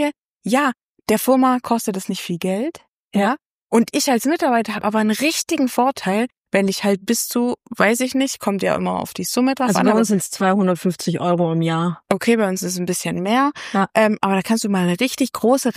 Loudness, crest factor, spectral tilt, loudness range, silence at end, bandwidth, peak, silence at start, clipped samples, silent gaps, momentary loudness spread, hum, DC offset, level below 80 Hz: -19 LUFS; 18 dB; -4.5 dB/octave; 2 LU; 0.05 s; 15.5 kHz; -2 dBFS; 0 s; under 0.1%; 0.26-0.36 s, 0.83-0.93 s, 2.89-3.11 s, 3.45-3.67 s, 6.37-6.44 s; 6 LU; none; under 0.1%; -62 dBFS